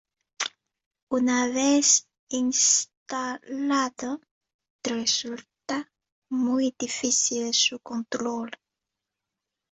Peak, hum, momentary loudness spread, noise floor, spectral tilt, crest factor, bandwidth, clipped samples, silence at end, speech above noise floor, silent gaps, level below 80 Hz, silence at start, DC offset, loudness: -8 dBFS; none; 14 LU; -86 dBFS; -0.5 dB/octave; 20 dB; 8.4 kHz; under 0.1%; 1.15 s; 61 dB; 0.86-0.91 s, 1.02-1.07 s, 2.19-2.27 s, 2.97-3.06 s, 4.31-4.41 s, 4.54-4.59 s, 4.70-4.79 s, 6.12-6.22 s; -72 dBFS; 0.4 s; under 0.1%; -25 LUFS